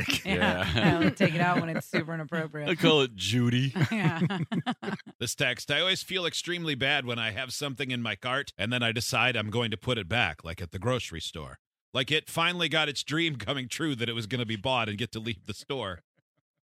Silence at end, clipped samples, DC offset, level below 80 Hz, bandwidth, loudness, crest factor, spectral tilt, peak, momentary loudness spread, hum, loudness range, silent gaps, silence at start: 0.7 s; under 0.1%; under 0.1%; -56 dBFS; 16 kHz; -28 LUFS; 24 dB; -4.5 dB/octave; -6 dBFS; 10 LU; none; 4 LU; 5.15-5.19 s, 11.59-11.71 s, 11.81-11.92 s; 0 s